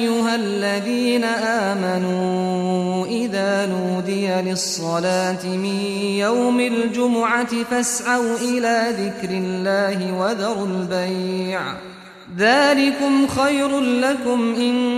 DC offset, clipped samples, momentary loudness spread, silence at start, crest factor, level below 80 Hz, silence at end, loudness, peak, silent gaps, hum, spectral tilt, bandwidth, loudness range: under 0.1%; under 0.1%; 6 LU; 0 s; 14 dB; -58 dBFS; 0 s; -20 LUFS; -4 dBFS; none; none; -4.5 dB/octave; 14.5 kHz; 3 LU